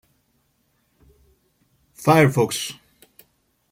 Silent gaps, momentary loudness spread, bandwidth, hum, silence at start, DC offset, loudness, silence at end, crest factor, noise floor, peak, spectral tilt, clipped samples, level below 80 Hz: none; 16 LU; 16.5 kHz; none; 2 s; under 0.1%; -19 LUFS; 1 s; 20 dB; -67 dBFS; -4 dBFS; -5.5 dB/octave; under 0.1%; -60 dBFS